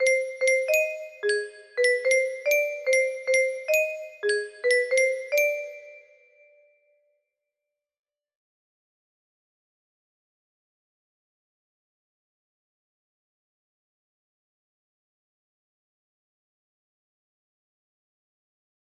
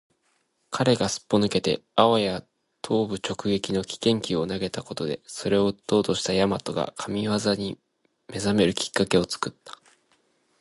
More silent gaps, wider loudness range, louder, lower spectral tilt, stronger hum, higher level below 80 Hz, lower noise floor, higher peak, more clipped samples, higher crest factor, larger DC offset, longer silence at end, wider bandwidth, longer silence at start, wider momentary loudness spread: neither; first, 6 LU vs 2 LU; about the same, -24 LUFS vs -25 LUFS; second, 1 dB/octave vs -5 dB/octave; neither; second, -80 dBFS vs -54 dBFS; first, -87 dBFS vs -70 dBFS; second, -10 dBFS vs -2 dBFS; neither; second, 18 dB vs 24 dB; neither; first, 12.85 s vs 0.9 s; first, 13.5 kHz vs 11.5 kHz; second, 0 s vs 0.7 s; about the same, 8 LU vs 9 LU